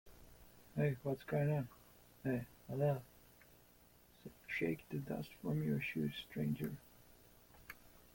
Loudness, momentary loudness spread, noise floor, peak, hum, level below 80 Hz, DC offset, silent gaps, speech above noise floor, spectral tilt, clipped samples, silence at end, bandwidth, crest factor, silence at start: -41 LUFS; 20 LU; -67 dBFS; -24 dBFS; 60 Hz at -65 dBFS; -68 dBFS; under 0.1%; none; 27 dB; -7.5 dB/octave; under 0.1%; 0.15 s; 17 kHz; 18 dB; 0.05 s